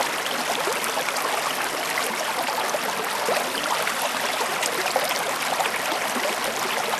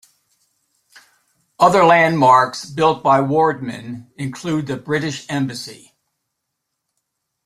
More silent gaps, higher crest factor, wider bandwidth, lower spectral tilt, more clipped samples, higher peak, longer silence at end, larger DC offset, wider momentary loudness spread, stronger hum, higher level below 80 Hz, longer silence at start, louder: neither; about the same, 20 dB vs 18 dB; about the same, 15 kHz vs 14.5 kHz; second, -0.5 dB/octave vs -5.5 dB/octave; neither; second, -6 dBFS vs -2 dBFS; second, 0 s vs 1.7 s; neither; second, 2 LU vs 17 LU; neither; second, -66 dBFS vs -60 dBFS; second, 0 s vs 1.6 s; second, -24 LUFS vs -16 LUFS